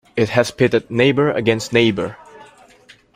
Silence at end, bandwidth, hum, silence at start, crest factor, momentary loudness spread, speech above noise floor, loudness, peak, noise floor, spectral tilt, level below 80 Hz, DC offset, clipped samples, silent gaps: 0.75 s; 16 kHz; none; 0.15 s; 16 dB; 4 LU; 32 dB; -17 LUFS; -2 dBFS; -49 dBFS; -5.5 dB/octave; -52 dBFS; under 0.1%; under 0.1%; none